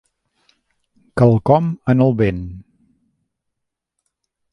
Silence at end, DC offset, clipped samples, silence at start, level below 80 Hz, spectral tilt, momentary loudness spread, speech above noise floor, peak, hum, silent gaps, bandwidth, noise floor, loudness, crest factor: 1.9 s; under 0.1%; under 0.1%; 1.15 s; -44 dBFS; -10 dB/octave; 15 LU; 63 dB; 0 dBFS; none; none; 10.5 kHz; -78 dBFS; -16 LUFS; 20 dB